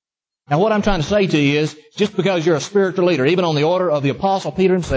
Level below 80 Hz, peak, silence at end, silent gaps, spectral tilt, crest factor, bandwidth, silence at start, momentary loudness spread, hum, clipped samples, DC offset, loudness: -40 dBFS; -4 dBFS; 0 s; none; -6 dB/octave; 14 dB; 8 kHz; 0.5 s; 4 LU; none; under 0.1%; under 0.1%; -17 LUFS